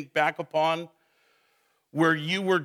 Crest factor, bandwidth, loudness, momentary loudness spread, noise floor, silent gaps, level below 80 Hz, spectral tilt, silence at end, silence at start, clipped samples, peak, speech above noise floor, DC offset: 18 dB; 15.5 kHz; -26 LUFS; 11 LU; -70 dBFS; none; -86 dBFS; -5.5 dB/octave; 0 s; 0 s; under 0.1%; -10 dBFS; 44 dB; under 0.1%